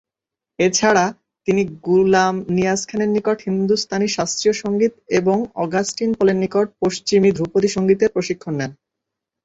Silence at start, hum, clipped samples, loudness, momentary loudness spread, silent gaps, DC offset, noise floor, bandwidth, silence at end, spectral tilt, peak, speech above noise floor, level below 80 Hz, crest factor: 0.6 s; none; under 0.1%; -19 LUFS; 6 LU; none; under 0.1%; -86 dBFS; 8.2 kHz; 0.7 s; -4.5 dB/octave; -2 dBFS; 68 dB; -54 dBFS; 16 dB